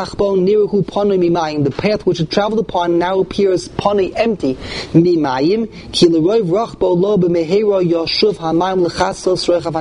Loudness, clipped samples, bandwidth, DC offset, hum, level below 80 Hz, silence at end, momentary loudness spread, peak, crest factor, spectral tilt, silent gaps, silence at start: -15 LUFS; under 0.1%; 11 kHz; under 0.1%; none; -42 dBFS; 0 s; 4 LU; 0 dBFS; 14 dB; -6 dB/octave; none; 0 s